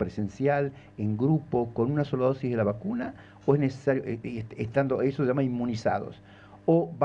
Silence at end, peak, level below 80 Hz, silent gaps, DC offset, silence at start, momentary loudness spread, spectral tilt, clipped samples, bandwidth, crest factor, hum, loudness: 0 s; -8 dBFS; -58 dBFS; none; under 0.1%; 0 s; 9 LU; -9 dB/octave; under 0.1%; 7.8 kHz; 18 dB; none; -28 LUFS